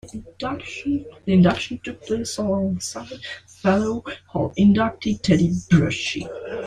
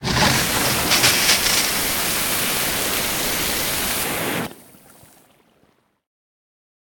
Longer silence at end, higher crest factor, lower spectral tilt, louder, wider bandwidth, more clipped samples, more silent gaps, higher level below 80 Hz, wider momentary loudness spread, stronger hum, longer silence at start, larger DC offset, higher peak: second, 0 s vs 2.25 s; about the same, 18 dB vs 20 dB; first, -6 dB/octave vs -1.5 dB/octave; second, -22 LUFS vs -18 LUFS; second, 10.5 kHz vs 19.5 kHz; neither; neither; second, -48 dBFS vs -42 dBFS; first, 14 LU vs 7 LU; neither; about the same, 0.05 s vs 0 s; neither; about the same, -4 dBFS vs -2 dBFS